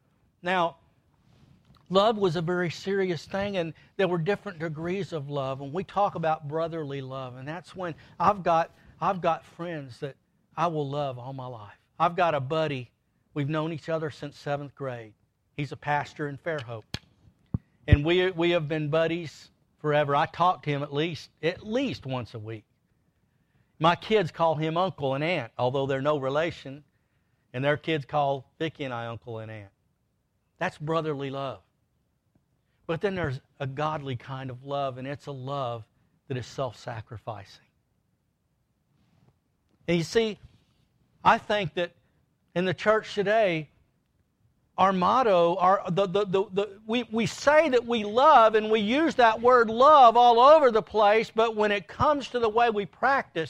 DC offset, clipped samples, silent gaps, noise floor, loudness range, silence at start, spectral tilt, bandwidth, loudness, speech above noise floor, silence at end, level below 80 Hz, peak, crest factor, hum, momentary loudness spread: under 0.1%; under 0.1%; none; -73 dBFS; 14 LU; 0.45 s; -6 dB/octave; 11.5 kHz; -26 LUFS; 48 dB; 0 s; -50 dBFS; -4 dBFS; 22 dB; none; 17 LU